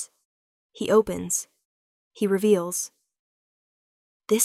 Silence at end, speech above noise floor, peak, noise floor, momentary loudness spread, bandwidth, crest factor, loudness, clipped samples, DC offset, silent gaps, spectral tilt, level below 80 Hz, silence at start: 0 s; over 67 dB; -4 dBFS; under -90 dBFS; 14 LU; 16 kHz; 22 dB; -24 LUFS; under 0.1%; under 0.1%; 0.25-0.69 s, 1.65-2.11 s, 3.19-4.20 s; -4 dB/octave; -62 dBFS; 0 s